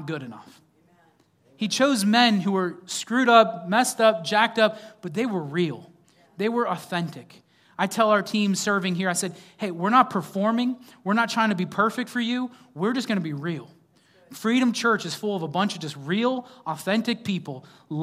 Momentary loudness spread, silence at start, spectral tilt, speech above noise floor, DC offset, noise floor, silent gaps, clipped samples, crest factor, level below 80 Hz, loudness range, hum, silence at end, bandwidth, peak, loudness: 14 LU; 0 s; -4.5 dB/octave; 38 dB; under 0.1%; -61 dBFS; none; under 0.1%; 22 dB; -78 dBFS; 6 LU; none; 0 s; 16 kHz; -2 dBFS; -24 LUFS